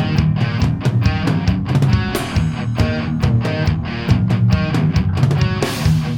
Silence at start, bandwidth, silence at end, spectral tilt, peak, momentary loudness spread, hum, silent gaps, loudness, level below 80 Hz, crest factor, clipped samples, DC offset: 0 s; 16.5 kHz; 0 s; -7 dB/octave; -2 dBFS; 4 LU; none; none; -17 LUFS; -28 dBFS; 14 dB; under 0.1%; under 0.1%